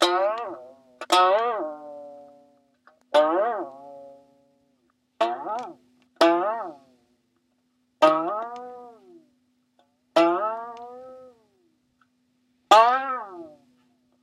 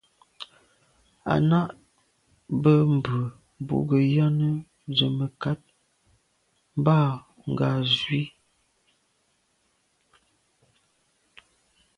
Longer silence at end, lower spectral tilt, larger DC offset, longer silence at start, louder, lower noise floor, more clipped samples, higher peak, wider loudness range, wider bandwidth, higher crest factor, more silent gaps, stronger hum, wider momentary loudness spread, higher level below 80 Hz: second, 0.75 s vs 3.7 s; second, -2.5 dB/octave vs -8 dB/octave; neither; second, 0 s vs 0.4 s; about the same, -23 LUFS vs -25 LUFS; about the same, -70 dBFS vs -70 dBFS; neither; first, -2 dBFS vs -6 dBFS; about the same, 5 LU vs 6 LU; first, 15.5 kHz vs 7 kHz; about the same, 24 dB vs 22 dB; neither; neither; first, 24 LU vs 16 LU; second, -80 dBFS vs -60 dBFS